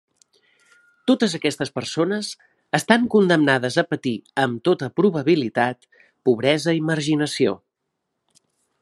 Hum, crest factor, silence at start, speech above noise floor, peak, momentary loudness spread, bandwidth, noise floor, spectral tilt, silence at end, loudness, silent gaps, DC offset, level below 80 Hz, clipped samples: none; 22 dB; 1.05 s; 58 dB; 0 dBFS; 9 LU; 13 kHz; -78 dBFS; -5 dB/octave; 1.25 s; -21 LUFS; none; under 0.1%; -66 dBFS; under 0.1%